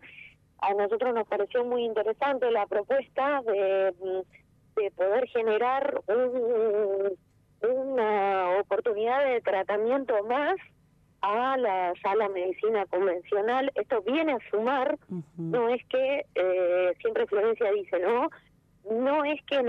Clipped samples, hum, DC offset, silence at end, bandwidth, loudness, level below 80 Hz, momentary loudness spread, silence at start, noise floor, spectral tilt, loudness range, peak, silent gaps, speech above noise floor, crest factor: under 0.1%; 50 Hz at -65 dBFS; under 0.1%; 0 s; 5.6 kHz; -27 LUFS; -72 dBFS; 6 LU; 0.05 s; -63 dBFS; -7 dB/octave; 1 LU; -16 dBFS; none; 36 dB; 12 dB